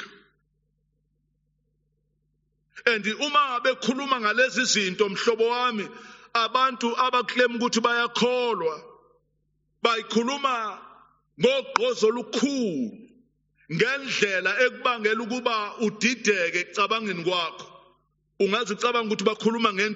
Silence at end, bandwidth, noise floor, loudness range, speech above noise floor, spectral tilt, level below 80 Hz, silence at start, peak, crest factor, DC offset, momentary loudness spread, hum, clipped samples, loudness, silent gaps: 0 s; 8 kHz; -72 dBFS; 4 LU; 48 dB; -1.5 dB/octave; -74 dBFS; 0 s; -2 dBFS; 24 dB; under 0.1%; 7 LU; none; under 0.1%; -24 LUFS; none